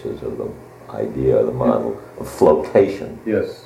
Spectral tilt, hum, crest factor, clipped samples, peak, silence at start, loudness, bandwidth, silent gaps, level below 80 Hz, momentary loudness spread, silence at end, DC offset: -7.5 dB/octave; none; 18 dB; under 0.1%; -2 dBFS; 0 s; -19 LUFS; 15 kHz; none; -44 dBFS; 15 LU; 0.05 s; under 0.1%